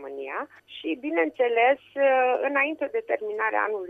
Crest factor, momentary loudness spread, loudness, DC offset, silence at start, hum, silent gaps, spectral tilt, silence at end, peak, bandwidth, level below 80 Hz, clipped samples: 16 dB; 12 LU; -25 LUFS; under 0.1%; 0 s; none; none; -5 dB/octave; 0 s; -10 dBFS; 3.9 kHz; -76 dBFS; under 0.1%